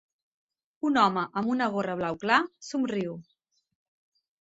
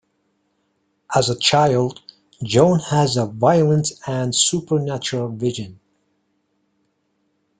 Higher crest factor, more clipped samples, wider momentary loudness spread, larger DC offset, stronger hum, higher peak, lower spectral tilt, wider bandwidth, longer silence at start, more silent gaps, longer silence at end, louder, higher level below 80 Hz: about the same, 22 dB vs 20 dB; neither; about the same, 9 LU vs 9 LU; neither; neither; second, -8 dBFS vs -2 dBFS; about the same, -5 dB/octave vs -4.5 dB/octave; second, 8 kHz vs 9.6 kHz; second, 0.85 s vs 1.1 s; neither; second, 1.2 s vs 1.85 s; second, -27 LUFS vs -18 LUFS; second, -70 dBFS vs -56 dBFS